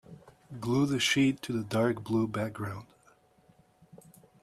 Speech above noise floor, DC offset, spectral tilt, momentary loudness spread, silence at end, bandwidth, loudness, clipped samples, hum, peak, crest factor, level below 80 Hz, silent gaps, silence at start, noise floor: 35 dB; under 0.1%; -5 dB/octave; 14 LU; 0.45 s; 14.5 kHz; -30 LUFS; under 0.1%; none; -14 dBFS; 18 dB; -66 dBFS; none; 0.1 s; -64 dBFS